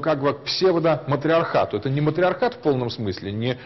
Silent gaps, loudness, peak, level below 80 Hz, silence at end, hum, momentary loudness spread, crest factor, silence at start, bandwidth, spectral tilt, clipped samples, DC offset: none; -22 LUFS; -10 dBFS; -56 dBFS; 0 s; none; 7 LU; 12 dB; 0 s; 6.2 kHz; -7 dB/octave; under 0.1%; 0.1%